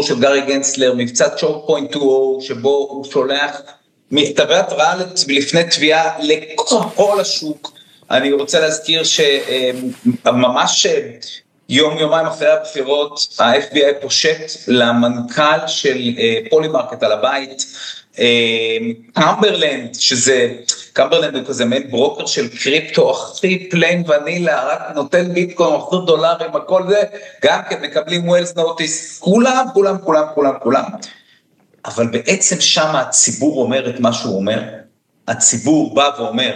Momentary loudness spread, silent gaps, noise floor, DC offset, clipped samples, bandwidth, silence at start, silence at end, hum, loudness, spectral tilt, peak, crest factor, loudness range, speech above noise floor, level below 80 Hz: 8 LU; none; -55 dBFS; under 0.1%; under 0.1%; 14 kHz; 0 s; 0 s; none; -15 LUFS; -3 dB/octave; 0 dBFS; 16 dB; 2 LU; 40 dB; -68 dBFS